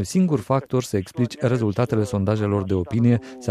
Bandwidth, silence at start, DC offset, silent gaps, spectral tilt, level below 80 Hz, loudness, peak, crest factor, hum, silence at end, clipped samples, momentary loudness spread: 14 kHz; 0 s; under 0.1%; none; -7.5 dB/octave; -52 dBFS; -22 LUFS; -6 dBFS; 16 dB; none; 0 s; under 0.1%; 4 LU